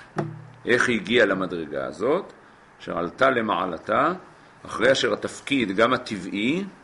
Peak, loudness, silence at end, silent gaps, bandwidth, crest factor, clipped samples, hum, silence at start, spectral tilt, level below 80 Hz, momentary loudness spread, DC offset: -6 dBFS; -23 LUFS; 0.1 s; none; 11.5 kHz; 20 dB; under 0.1%; none; 0 s; -4.5 dB/octave; -58 dBFS; 12 LU; under 0.1%